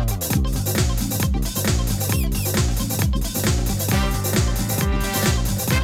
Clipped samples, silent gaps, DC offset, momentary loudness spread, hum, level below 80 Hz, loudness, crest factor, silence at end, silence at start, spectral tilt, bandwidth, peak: under 0.1%; none; under 0.1%; 2 LU; none; -26 dBFS; -21 LUFS; 14 dB; 0 s; 0 s; -4.5 dB/octave; 17.5 kHz; -6 dBFS